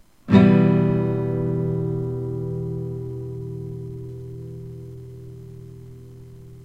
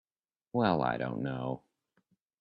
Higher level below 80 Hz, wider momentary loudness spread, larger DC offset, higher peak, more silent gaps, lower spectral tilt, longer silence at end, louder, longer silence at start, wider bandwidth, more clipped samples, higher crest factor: first, -50 dBFS vs -66 dBFS; first, 25 LU vs 10 LU; first, 0.2% vs under 0.1%; first, 0 dBFS vs -12 dBFS; neither; about the same, -10 dB/octave vs -10 dB/octave; second, 0 s vs 0.8 s; first, -22 LUFS vs -33 LUFS; second, 0.25 s vs 0.55 s; about the same, 5.4 kHz vs 5.4 kHz; neither; about the same, 22 dB vs 22 dB